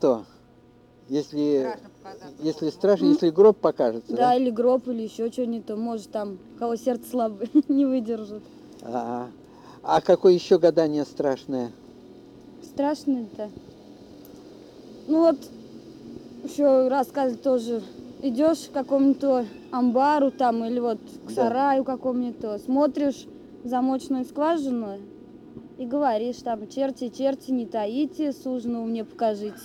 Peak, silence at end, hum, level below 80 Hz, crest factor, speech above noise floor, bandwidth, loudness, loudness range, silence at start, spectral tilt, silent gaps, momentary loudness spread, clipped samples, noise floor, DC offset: -6 dBFS; 0 s; none; -64 dBFS; 18 dB; 30 dB; 13.5 kHz; -24 LUFS; 6 LU; 0 s; -6.5 dB/octave; none; 18 LU; under 0.1%; -54 dBFS; under 0.1%